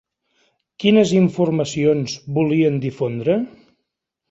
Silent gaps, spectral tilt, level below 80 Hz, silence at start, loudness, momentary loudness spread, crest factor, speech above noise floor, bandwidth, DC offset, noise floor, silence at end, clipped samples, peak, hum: none; -6.5 dB/octave; -58 dBFS; 0.8 s; -18 LUFS; 8 LU; 18 dB; 61 dB; 8 kHz; under 0.1%; -78 dBFS; 0.8 s; under 0.1%; -2 dBFS; none